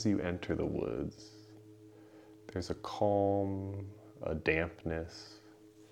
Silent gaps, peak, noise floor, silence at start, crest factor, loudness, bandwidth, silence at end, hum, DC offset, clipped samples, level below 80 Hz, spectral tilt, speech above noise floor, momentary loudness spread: none; -12 dBFS; -58 dBFS; 0 s; 24 dB; -36 LUFS; 12.5 kHz; 0.05 s; none; under 0.1%; under 0.1%; -56 dBFS; -6.5 dB/octave; 23 dB; 24 LU